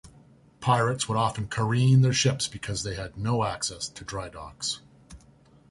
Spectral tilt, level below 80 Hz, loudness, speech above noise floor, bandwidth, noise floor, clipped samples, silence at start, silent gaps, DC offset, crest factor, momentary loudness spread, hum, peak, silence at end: -4.5 dB/octave; -52 dBFS; -26 LUFS; 31 dB; 11.5 kHz; -56 dBFS; under 0.1%; 0.05 s; none; under 0.1%; 18 dB; 15 LU; none; -8 dBFS; 0.55 s